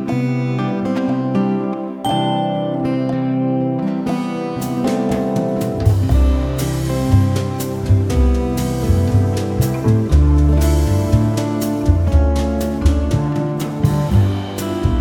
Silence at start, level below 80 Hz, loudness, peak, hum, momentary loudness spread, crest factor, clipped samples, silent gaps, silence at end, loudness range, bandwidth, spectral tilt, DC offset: 0 s; -22 dBFS; -17 LUFS; -2 dBFS; none; 5 LU; 14 dB; under 0.1%; none; 0 s; 3 LU; 18 kHz; -7.5 dB/octave; under 0.1%